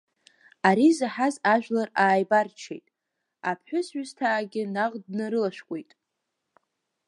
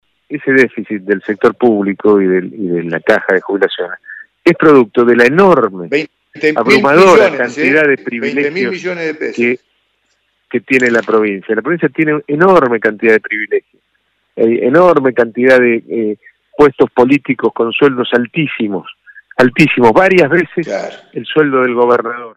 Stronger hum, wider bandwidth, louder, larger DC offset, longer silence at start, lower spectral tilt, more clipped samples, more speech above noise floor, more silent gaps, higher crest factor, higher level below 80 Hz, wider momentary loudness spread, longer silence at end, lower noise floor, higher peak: neither; about the same, 11.5 kHz vs 11.5 kHz; second, -25 LUFS vs -11 LUFS; neither; first, 0.65 s vs 0.3 s; about the same, -5.5 dB/octave vs -6.5 dB/octave; second, under 0.1% vs 0.3%; first, 57 dB vs 51 dB; neither; first, 22 dB vs 12 dB; second, -80 dBFS vs -50 dBFS; first, 16 LU vs 12 LU; first, 1.25 s vs 0.05 s; first, -82 dBFS vs -62 dBFS; second, -4 dBFS vs 0 dBFS